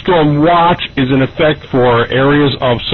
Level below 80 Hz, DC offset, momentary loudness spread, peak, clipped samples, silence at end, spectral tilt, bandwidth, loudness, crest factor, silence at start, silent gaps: -36 dBFS; under 0.1%; 4 LU; 0 dBFS; under 0.1%; 0 s; -9 dB/octave; 6 kHz; -11 LUFS; 10 dB; 0 s; none